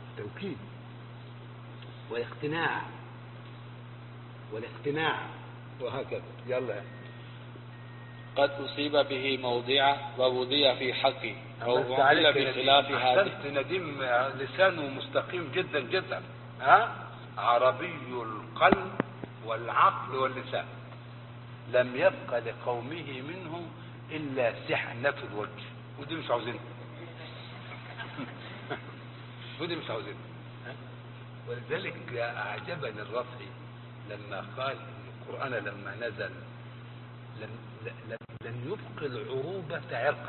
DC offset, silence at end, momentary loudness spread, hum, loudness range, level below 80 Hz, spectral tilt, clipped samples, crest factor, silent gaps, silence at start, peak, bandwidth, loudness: under 0.1%; 0 s; 21 LU; none; 14 LU; -66 dBFS; -9 dB/octave; under 0.1%; 26 dB; none; 0 s; -6 dBFS; 4.4 kHz; -30 LUFS